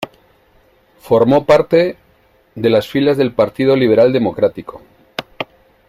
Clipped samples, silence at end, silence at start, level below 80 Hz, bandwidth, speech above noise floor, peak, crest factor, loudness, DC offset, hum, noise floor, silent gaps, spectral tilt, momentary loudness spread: under 0.1%; 0.45 s; 0 s; -50 dBFS; 15.5 kHz; 40 dB; 0 dBFS; 16 dB; -14 LUFS; under 0.1%; none; -53 dBFS; none; -7 dB/octave; 17 LU